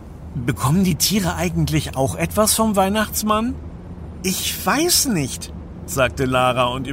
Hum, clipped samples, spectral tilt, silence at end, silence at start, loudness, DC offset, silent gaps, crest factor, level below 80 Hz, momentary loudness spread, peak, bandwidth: none; under 0.1%; -4 dB/octave; 0 s; 0 s; -19 LUFS; under 0.1%; none; 18 dB; -36 dBFS; 15 LU; -2 dBFS; 16.5 kHz